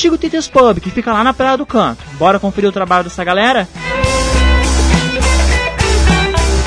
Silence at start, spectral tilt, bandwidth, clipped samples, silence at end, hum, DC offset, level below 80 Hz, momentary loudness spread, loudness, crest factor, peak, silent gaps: 0 s; -5 dB/octave; 10.5 kHz; under 0.1%; 0 s; none; under 0.1%; -18 dBFS; 5 LU; -13 LUFS; 12 dB; 0 dBFS; none